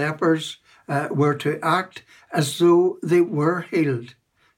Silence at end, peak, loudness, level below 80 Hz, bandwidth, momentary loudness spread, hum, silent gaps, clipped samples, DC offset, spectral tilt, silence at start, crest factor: 0.5 s; -6 dBFS; -21 LUFS; -72 dBFS; 16.5 kHz; 11 LU; none; none; under 0.1%; under 0.1%; -6 dB/octave; 0 s; 16 dB